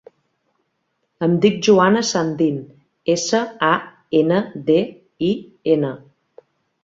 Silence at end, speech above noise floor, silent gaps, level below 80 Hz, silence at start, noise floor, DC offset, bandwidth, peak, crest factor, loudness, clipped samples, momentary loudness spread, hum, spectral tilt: 0.85 s; 54 dB; none; -62 dBFS; 1.2 s; -71 dBFS; under 0.1%; 7.8 kHz; -2 dBFS; 18 dB; -19 LUFS; under 0.1%; 10 LU; none; -5 dB/octave